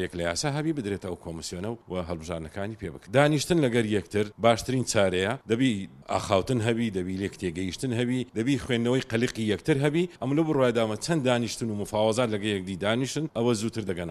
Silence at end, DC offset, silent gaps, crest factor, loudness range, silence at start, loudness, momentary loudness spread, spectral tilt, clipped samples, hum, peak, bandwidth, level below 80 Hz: 0 s; under 0.1%; none; 22 dB; 3 LU; 0 s; -27 LUFS; 10 LU; -5.5 dB/octave; under 0.1%; none; -4 dBFS; 14.5 kHz; -54 dBFS